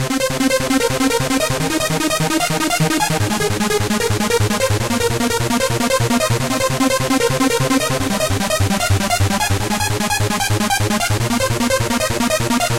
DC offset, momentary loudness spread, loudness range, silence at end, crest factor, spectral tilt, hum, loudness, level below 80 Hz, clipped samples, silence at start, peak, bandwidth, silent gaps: 2%; 2 LU; 1 LU; 0 s; 14 dB; -4 dB/octave; none; -17 LUFS; -34 dBFS; under 0.1%; 0 s; -4 dBFS; 17 kHz; none